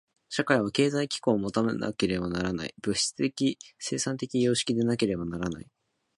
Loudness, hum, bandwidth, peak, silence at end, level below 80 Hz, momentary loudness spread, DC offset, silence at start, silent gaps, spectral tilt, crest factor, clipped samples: -28 LUFS; none; 11.5 kHz; -6 dBFS; 0.55 s; -56 dBFS; 8 LU; under 0.1%; 0.3 s; none; -4.5 dB/octave; 22 dB; under 0.1%